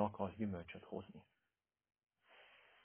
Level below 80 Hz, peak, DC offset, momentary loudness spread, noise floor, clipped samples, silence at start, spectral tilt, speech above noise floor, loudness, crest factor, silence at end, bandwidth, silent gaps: -70 dBFS; -22 dBFS; under 0.1%; 22 LU; under -90 dBFS; under 0.1%; 0 s; -6.5 dB/octave; over 44 dB; -46 LUFS; 24 dB; 0.25 s; 3.5 kHz; none